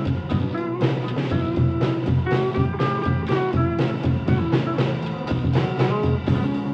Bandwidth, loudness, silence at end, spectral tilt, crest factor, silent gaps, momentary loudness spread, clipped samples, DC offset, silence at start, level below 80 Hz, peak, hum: 6.4 kHz; -22 LUFS; 0 s; -9 dB/octave; 16 dB; none; 3 LU; under 0.1%; under 0.1%; 0 s; -40 dBFS; -6 dBFS; none